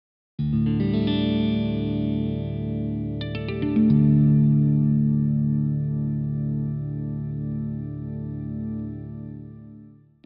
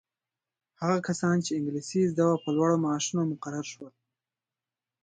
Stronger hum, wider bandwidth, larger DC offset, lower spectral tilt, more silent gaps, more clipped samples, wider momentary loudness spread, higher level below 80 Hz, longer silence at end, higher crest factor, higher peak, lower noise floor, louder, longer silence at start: neither; second, 5.2 kHz vs 9.4 kHz; neither; first, -9 dB/octave vs -5.5 dB/octave; neither; neither; first, 14 LU vs 11 LU; first, -44 dBFS vs -74 dBFS; second, 0.35 s vs 1.15 s; about the same, 16 dB vs 18 dB; first, -8 dBFS vs -12 dBFS; second, -48 dBFS vs under -90 dBFS; first, -24 LUFS vs -28 LUFS; second, 0.4 s vs 0.8 s